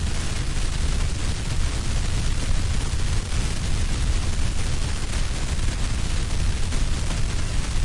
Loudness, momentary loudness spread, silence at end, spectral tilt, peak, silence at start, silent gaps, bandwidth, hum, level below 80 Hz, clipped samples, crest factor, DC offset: -27 LUFS; 2 LU; 0 s; -4 dB/octave; -10 dBFS; 0 s; none; 11.5 kHz; none; -24 dBFS; under 0.1%; 12 dB; under 0.1%